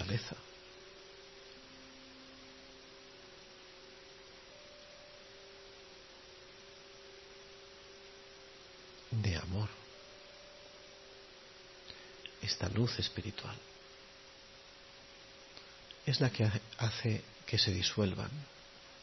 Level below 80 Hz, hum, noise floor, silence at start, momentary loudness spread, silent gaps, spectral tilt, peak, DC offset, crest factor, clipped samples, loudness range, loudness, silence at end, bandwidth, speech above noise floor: -64 dBFS; none; -56 dBFS; 0 s; 20 LU; none; -4.5 dB/octave; -16 dBFS; under 0.1%; 24 dB; under 0.1%; 19 LU; -37 LUFS; 0 s; 6.2 kHz; 21 dB